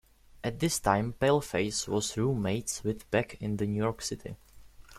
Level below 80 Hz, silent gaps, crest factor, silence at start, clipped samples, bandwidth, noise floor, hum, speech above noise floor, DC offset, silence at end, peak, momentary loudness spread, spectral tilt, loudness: -54 dBFS; none; 22 dB; 0.45 s; under 0.1%; 16 kHz; -52 dBFS; none; 21 dB; under 0.1%; 0 s; -10 dBFS; 10 LU; -4.5 dB/octave; -30 LUFS